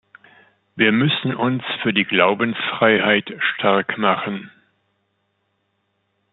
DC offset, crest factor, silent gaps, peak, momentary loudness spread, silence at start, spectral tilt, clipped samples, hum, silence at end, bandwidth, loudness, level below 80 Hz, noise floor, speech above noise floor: under 0.1%; 20 dB; none; -2 dBFS; 7 LU; 0.75 s; -9.5 dB/octave; under 0.1%; none; 1.85 s; 4.2 kHz; -18 LUFS; -66 dBFS; -70 dBFS; 51 dB